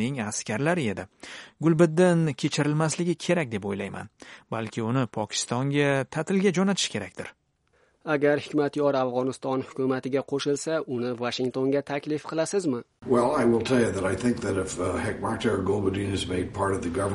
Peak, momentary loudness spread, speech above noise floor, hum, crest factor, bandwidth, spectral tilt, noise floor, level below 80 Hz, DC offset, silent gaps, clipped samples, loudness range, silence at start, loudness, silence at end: -8 dBFS; 10 LU; 41 dB; none; 18 dB; 11.5 kHz; -5.5 dB/octave; -67 dBFS; -56 dBFS; under 0.1%; none; under 0.1%; 3 LU; 0 s; -26 LUFS; 0 s